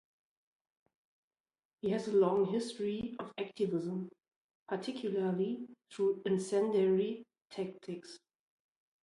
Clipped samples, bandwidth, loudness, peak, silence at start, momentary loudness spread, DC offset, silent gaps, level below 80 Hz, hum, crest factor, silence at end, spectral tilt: under 0.1%; 11.5 kHz; -35 LUFS; -18 dBFS; 1.85 s; 16 LU; under 0.1%; 4.36-4.49 s, 4.55-4.66 s; -76 dBFS; none; 18 dB; 0.85 s; -6.5 dB/octave